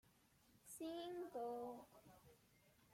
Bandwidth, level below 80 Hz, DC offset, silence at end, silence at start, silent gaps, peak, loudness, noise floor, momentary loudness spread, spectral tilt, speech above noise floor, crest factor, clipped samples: 16.5 kHz; -84 dBFS; under 0.1%; 0 s; 0.05 s; none; -40 dBFS; -51 LUFS; -75 dBFS; 19 LU; -4 dB/octave; 25 dB; 14 dB; under 0.1%